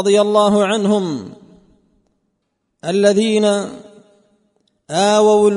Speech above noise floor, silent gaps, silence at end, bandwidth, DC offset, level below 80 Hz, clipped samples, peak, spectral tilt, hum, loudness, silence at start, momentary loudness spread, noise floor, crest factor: 57 dB; none; 0 s; 11 kHz; under 0.1%; -60 dBFS; under 0.1%; 0 dBFS; -5 dB/octave; none; -15 LUFS; 0 s; 16 LU; -71 dBFS; 16 dB